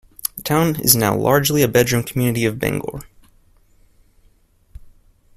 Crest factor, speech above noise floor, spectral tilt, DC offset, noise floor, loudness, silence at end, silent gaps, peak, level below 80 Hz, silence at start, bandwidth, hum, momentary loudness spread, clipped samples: 20 dB; 38 dB; -4.5 dB/octave; under 0.1%; -55 dBFS; -17 LUFS; 0.45 s; none; 0 dBFS; -46 dBFS; 0.25 s; 16 kHz; none; 12 LU; under 0.1%